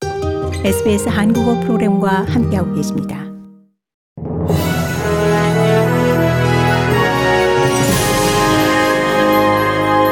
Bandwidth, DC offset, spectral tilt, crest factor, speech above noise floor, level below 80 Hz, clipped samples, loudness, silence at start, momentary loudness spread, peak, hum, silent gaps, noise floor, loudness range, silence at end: 18 kHz; under 0.1%; -5.5 dB/octave; 12 dB; 29 dB; -38 dBFS; under 0.1%; -14 LUFS; 0 s; 7 LU; -2 dBFS; none; 3.94-4.16 s; -44 dBFS; 5 LU; 0 s